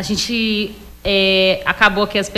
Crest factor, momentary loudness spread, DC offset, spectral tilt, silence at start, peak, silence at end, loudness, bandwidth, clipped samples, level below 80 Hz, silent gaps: 16 dB; 9 LU; under 0.1%; -3.5 dB/octave; 0 s; -2 dBFS; 0 s; -15 LUFS; 15.5 kHz; under 0.1%; -40 dBFS; none